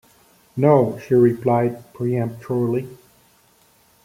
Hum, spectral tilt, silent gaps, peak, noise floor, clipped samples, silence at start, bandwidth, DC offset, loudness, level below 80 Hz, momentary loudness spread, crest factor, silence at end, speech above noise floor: none; -9.5 dB/octave; none; -2 dBFS; -57 dBFS; under 0.1%; 0.55 s; 15.5 kHz; under 0.1%; -20 LUFS; -60 dBFS; 11 LU; 18 dB; 1.1 s; 38 dB